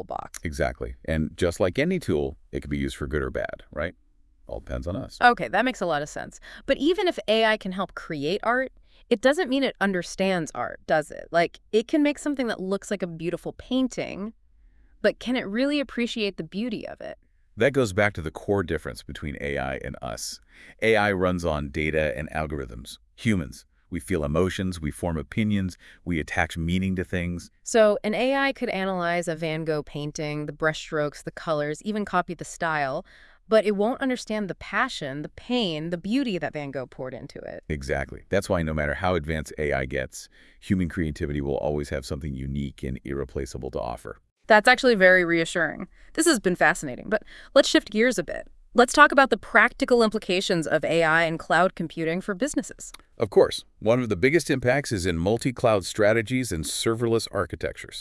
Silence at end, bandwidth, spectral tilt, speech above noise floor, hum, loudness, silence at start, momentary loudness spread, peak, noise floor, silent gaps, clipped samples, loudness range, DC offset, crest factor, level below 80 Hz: 0 s; 12 kHz; -5 dB/octave; 31 dB; none; -25 LUFS; 0 s; 14 LU; 0 dBFS; -56 dBFS; 44.31-44.36 s; under 0.1%; 8 LU; under 0.1%; 26 dB; -46 dBFS